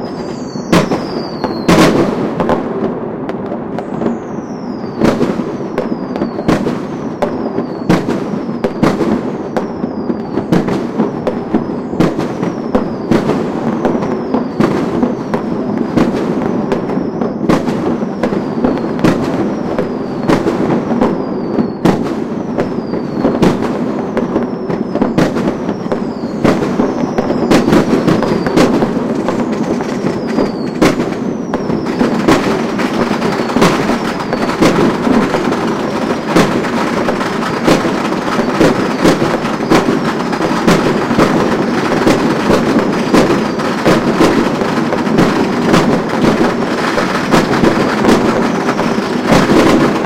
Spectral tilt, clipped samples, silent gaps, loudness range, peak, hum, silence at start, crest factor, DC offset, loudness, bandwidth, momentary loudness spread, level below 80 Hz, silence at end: -6 dB/octave; under 0.1%; none; 4 LU; 0 dBFS; none; 0 s; 14 dB; 0.7%; -14 LUFS; 16 kHz; 8 LU; -36 dBFS; 0 s